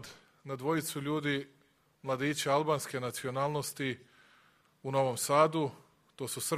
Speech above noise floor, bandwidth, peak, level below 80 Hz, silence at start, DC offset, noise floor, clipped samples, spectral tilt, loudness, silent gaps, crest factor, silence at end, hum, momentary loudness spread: 34 dB; 15.5 kHz; -12 dBFS; -74 dBFS; 0 s; under 0.1%; -66 dBFS; under 0.1%; -4.5 dB/octave; -33 LUFS; none; 22 dB; 0 s; none; 17 LU